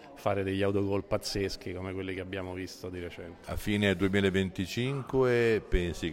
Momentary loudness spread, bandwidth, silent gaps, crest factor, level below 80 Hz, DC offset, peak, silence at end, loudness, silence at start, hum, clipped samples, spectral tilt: 13 LU; 16 kHz; none; 18 dB; -44 dBFS; under 0.1%; -12 dBFS; 0 s; -31 LUFS; 0 s; none; under 0.1%; -6 dB/octave